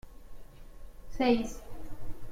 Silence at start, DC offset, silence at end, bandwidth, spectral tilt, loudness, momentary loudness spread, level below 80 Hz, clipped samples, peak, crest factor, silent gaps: 0.05 s; under 0.1%; 0 s; 16 kHz; -5.5 dB/octave; -30 LUFS; 21 LU; -46 dBFS; under 0.1%; -14 dBFS; 20 dB; none